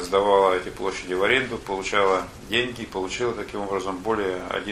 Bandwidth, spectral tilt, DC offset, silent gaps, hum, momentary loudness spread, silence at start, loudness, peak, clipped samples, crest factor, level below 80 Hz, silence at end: 13.5 kHz; -4 dB/octave; under 0.1%; none; none; 9 LU; 0 s; -24 LUFS; -6 dBFS; under 0.1%; 20 dB; -48 dBFS; 0 s